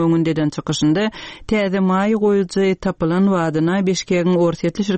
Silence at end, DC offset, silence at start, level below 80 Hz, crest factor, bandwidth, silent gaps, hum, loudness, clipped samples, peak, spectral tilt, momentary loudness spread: 0 s; 0.1%; 0 s; -46 dBFS; 12 dB; 8.8 kHz; none; none; -18 LUFS; under 0.1%; -6 dBFS; -6 dB/octave; 4 LU